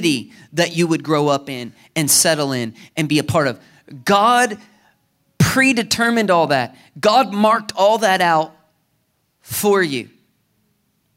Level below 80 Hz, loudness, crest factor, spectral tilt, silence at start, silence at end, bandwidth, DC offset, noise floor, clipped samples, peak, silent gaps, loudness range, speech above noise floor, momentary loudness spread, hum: -54 dBFS; -17 LUFS; 16 dB; -3.5 dB/octave; 0 s; 1.1 s; 16 kHz; under 0.1%; -66 dBFS; under 0.1%; -2 dBFS; none; 3 LU; 49 dB; 13 LU; none